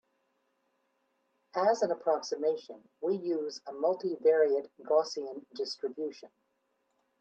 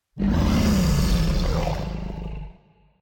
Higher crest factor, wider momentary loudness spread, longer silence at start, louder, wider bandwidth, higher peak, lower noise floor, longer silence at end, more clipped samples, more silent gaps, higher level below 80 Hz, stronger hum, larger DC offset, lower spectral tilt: first, 18 dB vs 10 dB; second, 12 LU vs 15 LU; first, 1.55 s vs 0.15 s; second, -31 LUFS vs -23 LUFS; second, 8.2 kHz vs 17 kHz; about the same, -14 dBFS vs -12 dBFS; first, -78 dBFS vs -55 dBFS; first, 0.95 s vs 0.5 s; neither; neither; second, -88 dBFS vs -26 dBFS; neither; neither; second, -4 dB/octave vs -6 dB/octave